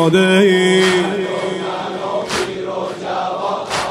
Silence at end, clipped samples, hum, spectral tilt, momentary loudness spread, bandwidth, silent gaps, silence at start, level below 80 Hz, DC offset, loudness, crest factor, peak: 0 s; under 0.1%; none; -5 dB/octave; 11 LU; 14 kHz; none; 0 s; -54 dBFS; under 0.1%; -16 LUFS; 16 dB; 0 dBFS